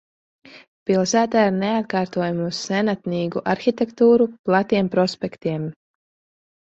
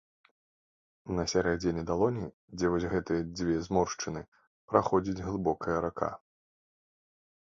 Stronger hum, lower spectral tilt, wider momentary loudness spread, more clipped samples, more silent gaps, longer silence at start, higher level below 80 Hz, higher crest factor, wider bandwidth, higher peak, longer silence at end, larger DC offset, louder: neither; about the same, -5.5 dB/octave vs -5.5 dB/octave; about the same, 9 LU vs 9 LU; neither; second, 0.68-0.86 s, 4.39-4.44 s vs 2.34-2.48 s, 4.28-4.32 s, 4.47-4.68 s; second, 0.55 s vs 1.05 s; second, -60 dBFS vs -52 dBFS; second, 18 dB vs 24 dB; about the same, 8 kHz vs 7.8 kHz; first, -2 dBFS vs -8 dBFS; second, 1.05 s vs 1.4 s; neither; first, -21 LUFS vs -31 LUFS